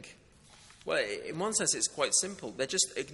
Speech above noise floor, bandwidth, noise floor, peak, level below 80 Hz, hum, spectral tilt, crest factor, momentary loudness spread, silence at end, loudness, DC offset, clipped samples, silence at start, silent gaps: 26 dB; 11.5 kHz; -58 dBFS; -12 dBFS; -68 dBFS; none; -1 dB/octave; 20 dB; 9 LU; 0 s; -30 LUFS; under 0.1%; under 0.1%; 0 s; none